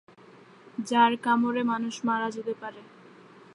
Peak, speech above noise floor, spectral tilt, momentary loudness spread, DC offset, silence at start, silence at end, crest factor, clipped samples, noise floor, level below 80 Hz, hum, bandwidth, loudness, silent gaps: -8 dBFS; 26 dB; -4.5 dB/octave; 16 LU; under 0.1%; 0.8 s; 0.7 s; 20 dB; under 0.1%; -53 dBFS; -82 dBFS; none; 11.5 kHz; -27 LUFS; none